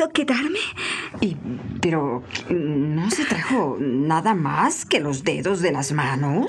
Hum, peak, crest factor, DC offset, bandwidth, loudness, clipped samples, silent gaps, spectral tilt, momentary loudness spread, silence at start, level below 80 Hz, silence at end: none; -6 dBFS; 16 dB; under 0.1%; 12.5 kHz; -22 LUFS; under 0.1%; none; -5 dB/octave; 6 LU; 0 s; -56 dBFS; 0 s